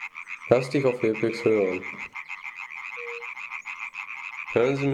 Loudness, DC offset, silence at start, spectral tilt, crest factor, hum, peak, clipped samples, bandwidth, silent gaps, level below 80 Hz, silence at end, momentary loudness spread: -27 LUFS; under 0.1%; 0 s; -6.5 dB/octave; 22 dB; none; -6 dBFS; under 0.1%; 11.5 kHz; none; -66 dBFS; 0 s; 12 LU